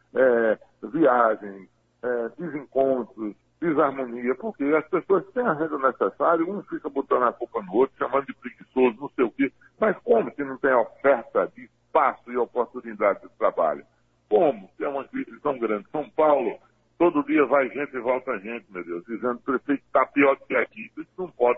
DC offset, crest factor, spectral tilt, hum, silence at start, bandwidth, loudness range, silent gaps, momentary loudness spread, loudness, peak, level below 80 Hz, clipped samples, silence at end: under 0.1%; 18 dB; -9 dB/octave; none; 0.15 s; 3.9 kHz; 2 LU; none; 12 LU; -24 LUFS; -6 dBFS; -68 dBFS; under 0.1%; 0 s